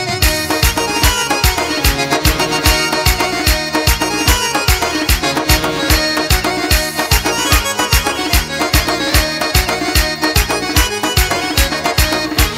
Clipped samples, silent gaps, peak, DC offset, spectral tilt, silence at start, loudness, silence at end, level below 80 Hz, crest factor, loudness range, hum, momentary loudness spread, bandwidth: under 0.1%; none; 0 dBFS; under 0.1%; -3 dB/octave; 0 s; -13 LUFS; 0 s; -20 dBFS; 14 dB; 1 LU; none; 2 LU; 16.5 kHz